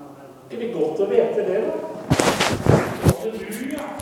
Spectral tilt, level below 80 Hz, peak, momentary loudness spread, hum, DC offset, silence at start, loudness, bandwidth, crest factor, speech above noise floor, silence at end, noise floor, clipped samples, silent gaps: -5.5 dB/octave; -42 dBFS; 0 dBFS; 11 LU; none; under 0.1%; 0 s; -21 LUFS; 18.5 kHz; 22 dB; 19 dB; 0 s; -41 dBFS; under 0.1%; none